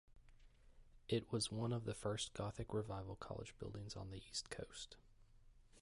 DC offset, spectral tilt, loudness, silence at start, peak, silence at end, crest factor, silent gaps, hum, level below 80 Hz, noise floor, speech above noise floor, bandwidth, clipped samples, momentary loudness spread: under 0.1%; -5 dB/octave; -46 LUFS; 0.1 s; -28 dBFS; 0 s; 20 dB; none; none; -64 dBFS; -66 dBFS; 20 dB; 11.5 kHz; under 0.1%; 11 LU